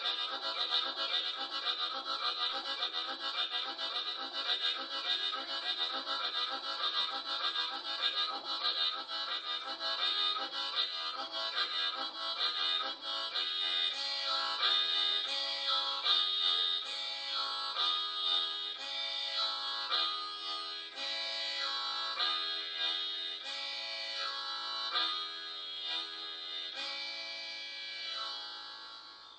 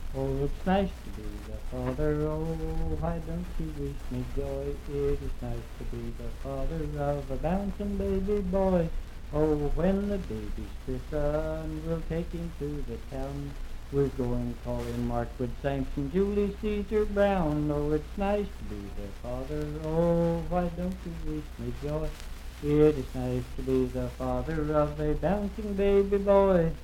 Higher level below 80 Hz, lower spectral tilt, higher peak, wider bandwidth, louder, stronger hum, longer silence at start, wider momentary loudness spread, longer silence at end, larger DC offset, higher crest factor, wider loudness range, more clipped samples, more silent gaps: second, -86 dBFS vs -36 dBFS; second, 1 dB/octave vs -8 dB/octave; second, -14 dBFS vs -10 dBFS; second, 9.2 kHz vs 16 kHz; second, -33 LUFS vs -30 LUFS; second, 60 Hz at -85 dBFS vs 60 Hz at -40 dBFS; about the same, 0 s vs 0 s; second, 8 LU vs 13 LU; about the same, 0 s vs 0 s; neither; about the same, 22 dB vs 20 dB; about the same, 6 LU vs 6 LU; neither; neither